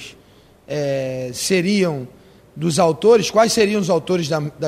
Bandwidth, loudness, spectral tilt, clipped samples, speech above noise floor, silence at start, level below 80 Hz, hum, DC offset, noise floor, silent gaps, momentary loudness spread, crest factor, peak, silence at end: 15.5 kHz; -18 LUFS; -4.5 dB/octave; under 0.1%; 32 dB; 0 s; -54 dBFS; none; under 0.1%; -49 dBFS; none; 12 LU; 16 dB; -2 dBFS; 0 s